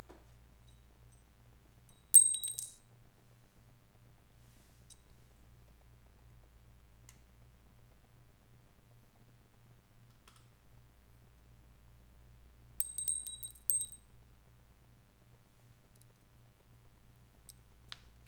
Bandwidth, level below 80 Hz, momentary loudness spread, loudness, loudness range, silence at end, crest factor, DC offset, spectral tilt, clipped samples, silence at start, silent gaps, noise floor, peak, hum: over 20 kHz; -66 dBFS; 31 LU; -29 LUFS; 14 LU; 4.35 s; 40 dB; under 0.1%; 0.5 dB/octave; under 0.1%; 2.15 s; none; -65 dBFS; -2 dBFS; none